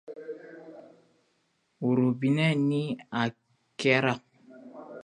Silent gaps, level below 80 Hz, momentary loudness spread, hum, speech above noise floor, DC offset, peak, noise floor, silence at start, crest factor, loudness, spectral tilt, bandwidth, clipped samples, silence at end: none; -74 dBFS; 22 LU; none; 47 dB; under 0.1%; -8 dBFS; -73 dBFS; 0.1 s; 22 dB; -27 LUFS; -6.5 dB/octave; 10.5 kHz; under 0.1%; 0 s